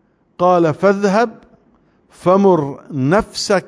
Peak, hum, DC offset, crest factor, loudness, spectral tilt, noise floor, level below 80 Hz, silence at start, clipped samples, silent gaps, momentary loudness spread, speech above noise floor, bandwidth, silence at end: -2 dBFS; none; under 0.1%; 14 dB; -15 LUFS; -6 dB/octave; -55 dBFS; -46 dBFS; 0.4 s; under 0.1%; none; 9 LU; 40 dB; 11 kHz; 0.05 s